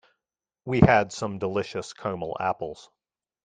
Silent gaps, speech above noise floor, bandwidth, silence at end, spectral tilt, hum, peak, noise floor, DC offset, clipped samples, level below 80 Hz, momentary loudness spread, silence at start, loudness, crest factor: none; 63 dB; 9.4 kHz; 0.65 s; -6.5 dB/octave; none; -2 dBFS; -88 dBFS; under 0.1%; under 0.1%; -48 dBFS; 17 LU; 0.65 s; -25 LUFS; 26 dB